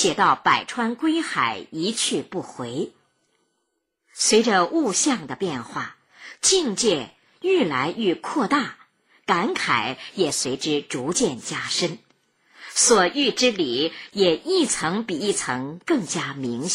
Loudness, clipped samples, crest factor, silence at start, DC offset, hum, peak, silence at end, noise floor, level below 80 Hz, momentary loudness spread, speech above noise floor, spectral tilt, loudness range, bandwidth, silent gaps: -22 LUFS; under 0.1%; 18 dB; 0 s; under 0.1%; none; -4 dBFS; 0 s; -75 dBFS; -62 dBFS; 12 LU; 53 dB; -2.5 dB/octave; 4 LU; 15.5 kHz; none